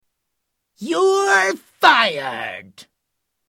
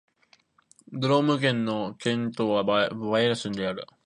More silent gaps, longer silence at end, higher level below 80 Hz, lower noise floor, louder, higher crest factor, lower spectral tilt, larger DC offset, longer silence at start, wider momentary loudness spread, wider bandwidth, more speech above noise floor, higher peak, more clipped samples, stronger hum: neither; first, 0.65 s vs 0.2 s; about the same, -68 dBFS vs -66 dBFS; first, -77 dBFS vs -64 dBFS; first, -16 LUFS vs -26 LUFS; about the same, 20 dB vs 18 dB; second, -2 dB/octave vs -6 dB/octave; neither; about the same, 0.8 s vs 0.9 s; first, 17 LU vs 7 LU; first, 16.5 kHz vs 10.5 kHz; first, 59 dB vs 38 dB; first, 0 dBFS vs -8 dBFS; neither; neither